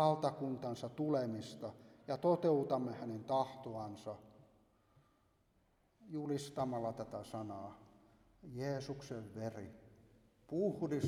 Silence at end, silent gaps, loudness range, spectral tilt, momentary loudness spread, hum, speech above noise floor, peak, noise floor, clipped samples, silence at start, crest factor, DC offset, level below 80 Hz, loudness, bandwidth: 0 s; none; 9 LU; -7 dB/octave; 16 LU; none; 36 dB; -20 dBFS; -75 dBFS; under 0.1%; 0 s; 22 dB; under 0.1%; -74 dBFS; -40 LUFS; 15 kHz